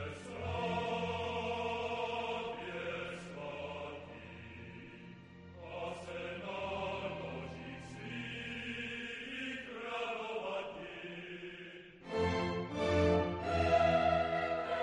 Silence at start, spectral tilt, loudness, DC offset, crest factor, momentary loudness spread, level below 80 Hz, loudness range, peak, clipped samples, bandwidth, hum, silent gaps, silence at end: 0 s; -6 dB/octave; -38 LUFS; under 0.1%; 20 dB; 18 LU; -58 dBFS; 12 LU; -18 dBFS; under 0.1%; 11 kHz; none; none; 0 s